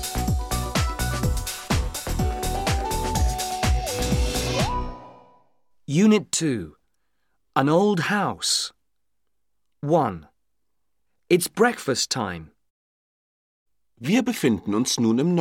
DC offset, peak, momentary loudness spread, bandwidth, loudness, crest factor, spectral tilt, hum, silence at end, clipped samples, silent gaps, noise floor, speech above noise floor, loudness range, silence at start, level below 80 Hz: under 0.1%; -4 dBFS; 10 LU; 17 kHz; -23 LUFS; 22 dB; -4.5 dB/octave; none; 0 s; under 0.1%; 12.70-13.66 s; -81 dBFS; 60 dB; 3 LU; 0 s; -34 dBFS